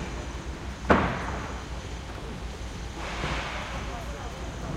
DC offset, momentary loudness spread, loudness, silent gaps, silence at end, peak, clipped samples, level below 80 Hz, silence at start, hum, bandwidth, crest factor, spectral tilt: under 0.1%; 14 LU; -32 LUFS; none; 0 s; -6 dBFS; under 0.1%; -38 dBFS; 0 s; none; 14 kHz; 26 dB; -5 dB/octave